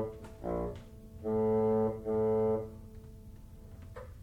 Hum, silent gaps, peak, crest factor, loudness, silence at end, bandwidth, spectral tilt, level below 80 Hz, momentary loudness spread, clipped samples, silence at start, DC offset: none; none; -22 dBFS; 12 dB; -33 LUFS; 0 s; 9.8 kHz; -9.5 dB/octave; -52 dBFS; 23 LU; under 0.1%; 0 s; under 0.1%